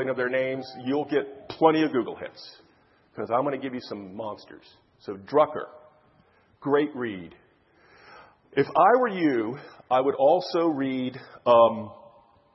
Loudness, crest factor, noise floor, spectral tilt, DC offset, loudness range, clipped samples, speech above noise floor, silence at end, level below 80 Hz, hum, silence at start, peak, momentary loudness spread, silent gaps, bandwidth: -25 LUFS; 20 dB; -61 dBFS; -7.5 dB/octave; under 0.1%; 8 LU; under 0.1%; 37 dB; 0.6 s; -72 dBFS; none; 0 s; -6 dBFS; 20 LU; none; 6 kHz